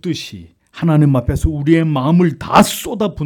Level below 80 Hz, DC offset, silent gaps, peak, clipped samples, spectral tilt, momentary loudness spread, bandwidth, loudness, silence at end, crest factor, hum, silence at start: -30 dBFS; under 0.1%; none; 0 dBFS; under 0.1%; -6.5 dB/octave; 9 LU; 18 kHz; -15 LUFS; 0 s; 14 dB; none; 0.05 s